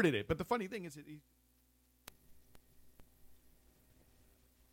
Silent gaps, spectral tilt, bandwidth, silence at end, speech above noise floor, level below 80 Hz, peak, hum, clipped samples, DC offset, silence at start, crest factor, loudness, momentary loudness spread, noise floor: none; -6 dB/octave; 16.5 kHz; 1.4 s; 35 dB; -66 dBFS; -18 dBFS; 60 Hz at -75 dBFS; under 0.1%; under 0.1%; 0 s; 24 dB; -39 LUFS; 22 LU; -72 dBFS